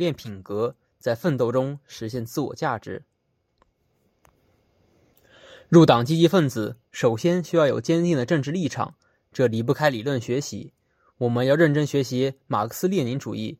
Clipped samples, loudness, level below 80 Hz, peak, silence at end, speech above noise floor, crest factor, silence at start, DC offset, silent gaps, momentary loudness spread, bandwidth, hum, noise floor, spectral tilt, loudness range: under 0.1%; -23 LUFS; -64 dBFS; -2 dBFS; 0.05 s; 49 dB; 22 dB; 0 s; under 0.1%; none; 14 LU; 16 kHz; none; -71 dBFS; -6.5 dB/octave; 12 LU